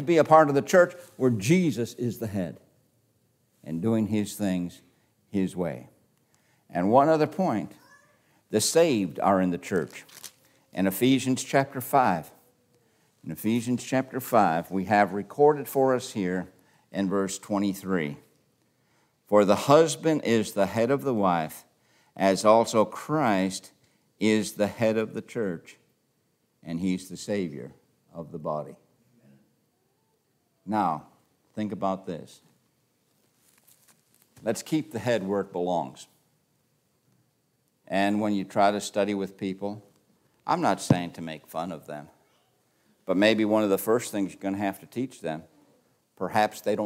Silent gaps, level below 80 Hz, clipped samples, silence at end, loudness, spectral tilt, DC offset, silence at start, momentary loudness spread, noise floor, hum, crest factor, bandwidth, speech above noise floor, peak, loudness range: none; -70 dBFS; under 0.1%; 0 s; -26 LUFS; -5.5 dB/octave; under 0.1%; 0 s; 17 LU; -71 dBFS; none; 24 dB; 16 kHz; 46 dB; -4 dBFS; 10 LU